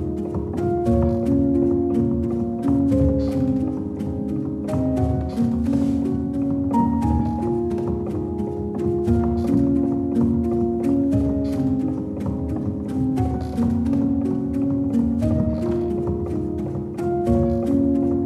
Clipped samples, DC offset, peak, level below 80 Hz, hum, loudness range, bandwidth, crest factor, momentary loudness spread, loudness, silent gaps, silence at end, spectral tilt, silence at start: under 0.1%; under 0.1%; -6 dBFS; -34 dBFS; none; 2 LU; 11.5 kHz; 14 dB; 7 LU; -22 LUFS; none; 0 s; -10 dB/octave; 0 s